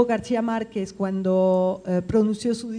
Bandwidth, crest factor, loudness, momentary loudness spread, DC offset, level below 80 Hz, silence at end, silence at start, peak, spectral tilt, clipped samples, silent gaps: 10 kHz; 18 dB; -23 LUFS; 7 LU; under 0.1%; -54 dBFS; 0 s; 0 s; -6 dBFS; -7 dB/octave; under 0.1%; none